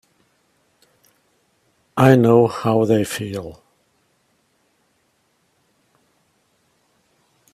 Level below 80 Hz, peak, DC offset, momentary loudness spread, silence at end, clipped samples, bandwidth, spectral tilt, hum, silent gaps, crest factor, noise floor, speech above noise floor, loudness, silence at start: -58 dBFS; 0 dBFS; under 0.1%; 18 LU; 4 s; under 0.1%; 15.5 kHz; -7 dB/octave; none; none; 22 dB; -65 dBFS; 49 dB; -17 LUFS; 1.95 s